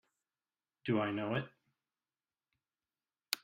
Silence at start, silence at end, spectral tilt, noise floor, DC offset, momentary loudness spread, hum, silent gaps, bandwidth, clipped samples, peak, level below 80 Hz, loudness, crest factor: 0.85 s; 0.05 s; -5 dB/octave; under -90 dBFS; under 0.1%; 11 LU; none; none; 13.5 kHz; under 0.1%; -12 dBFS; -78 dBFS; -37 LUFS; 30 dB